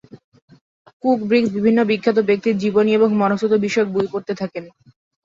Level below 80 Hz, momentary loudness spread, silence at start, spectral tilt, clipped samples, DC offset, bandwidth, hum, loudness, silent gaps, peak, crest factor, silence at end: -60 dBFS; 9 LU; 0.15 s; -6.5 dB/octave; under 0.1%; under 0.1%; 7.6 kHz; none; -18 LUFS; 0.24-0.32 s, 0.42-0.48 s, 0.61-0.86 s, 0.93-1.00 s; -4 dBFS; 16 dB; 0.55 s